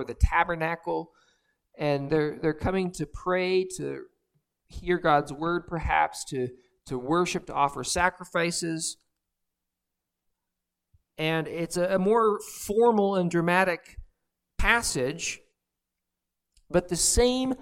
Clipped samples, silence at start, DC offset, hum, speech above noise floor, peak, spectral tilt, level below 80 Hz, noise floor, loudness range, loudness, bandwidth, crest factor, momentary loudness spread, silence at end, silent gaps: under 0.1%; 0 s; under 0.1%; none; 59 dB; -6 dBFS; -4 dB/octave; -40 dBFS; -85 dBFS; 6 LU; -26 LUFS; 17 kHz; 22 dB; 11 LU; 0 s; none